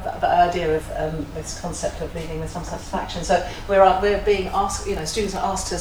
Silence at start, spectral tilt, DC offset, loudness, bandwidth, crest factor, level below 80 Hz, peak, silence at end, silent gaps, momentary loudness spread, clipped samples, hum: 0 s; -4 dB/octave; under 0.1%; -22 LUFS; over 20 kHz; 20 dB; -36 dBFS; -2 dBFS; 0 s; none; 13 LU; under 0.1%; none